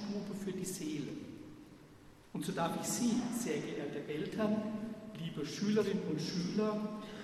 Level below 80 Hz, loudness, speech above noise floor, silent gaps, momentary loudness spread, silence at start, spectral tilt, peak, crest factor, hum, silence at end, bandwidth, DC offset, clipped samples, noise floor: -70 dBFS; -38 LUFS; 22 dB; none; 14 LU; 0 s; -5 dB/octave; -22 dBFS; 16 dB; none; 0 s; 13.5 kHz; under 0.1%; under 0.1%; -58 dBFS